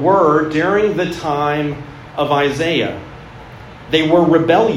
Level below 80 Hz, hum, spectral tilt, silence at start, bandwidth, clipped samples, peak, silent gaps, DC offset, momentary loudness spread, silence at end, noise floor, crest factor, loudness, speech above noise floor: -44 dBFS; none; -6 dB/octave; 0 s; 13.5 kHz; under 0.1%; 0 dBFS; none; under 0.1%; 23 LU; 0 s; -35 dBFS; 16 dB; -15 LUFS; 21 dB